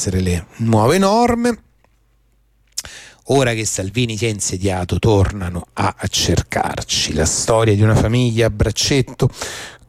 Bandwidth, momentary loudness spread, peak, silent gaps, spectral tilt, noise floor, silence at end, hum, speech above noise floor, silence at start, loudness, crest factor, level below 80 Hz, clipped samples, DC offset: 15.5 kHz; 12 LU; -4 dBFS; none; -4.5 dB/octave; -57 dBFS; 0.15 s; none; 41 dB; 0 s; -17 LUFS; 14 dB; -34 dBFS; under 0.1%; under 0.1%